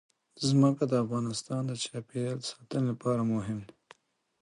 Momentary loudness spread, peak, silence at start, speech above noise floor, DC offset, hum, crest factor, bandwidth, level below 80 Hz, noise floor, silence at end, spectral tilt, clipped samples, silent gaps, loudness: 11 LU; -14 dBFS; 0.35 s; 32 dB; under 0.1%; none; 18 dB; 11.5 kHz; -66 dBFS; -61 dBFS; 0.75 s; -6 dB/octave; under 0.1%; none; -31 LUFS